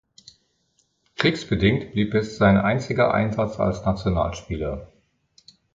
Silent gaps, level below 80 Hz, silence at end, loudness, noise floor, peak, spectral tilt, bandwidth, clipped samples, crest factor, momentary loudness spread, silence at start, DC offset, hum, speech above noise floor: none; -40 dBFS; 0.9 s; -22 LUFS; -68 dBFS; -2 dBFS; -7 dB/octave; 7.8 kHz; under 0.1%; 22 dB; 11 LU; 1.2 s; under 0.1%; none; 46 dB